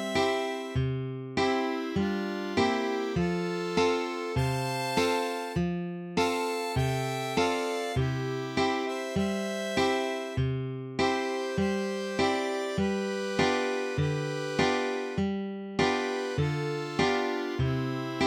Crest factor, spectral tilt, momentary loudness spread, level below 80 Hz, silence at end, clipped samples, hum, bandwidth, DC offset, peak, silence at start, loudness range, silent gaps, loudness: 18 dB; -5.5 dB/octave; 5 LU; -52 dBFS; 0 s; under 0.1%; none; 17 kHz; under 0.1%; -12 dBFS; 0 s; 1 LU; none; -29 LUFS